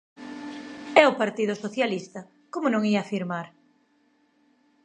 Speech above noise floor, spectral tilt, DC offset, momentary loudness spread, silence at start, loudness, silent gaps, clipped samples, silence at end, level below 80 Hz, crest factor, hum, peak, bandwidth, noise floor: 40 dB; -5.5 dB/octave; under 0.1%; 22 LU; 0.2 s; -24 LUFS; none; under 0.1%; 1.35 s; -76 dBFS; 26 dB; none; 0 dBFS; 9.2 kHz; -66 dBFS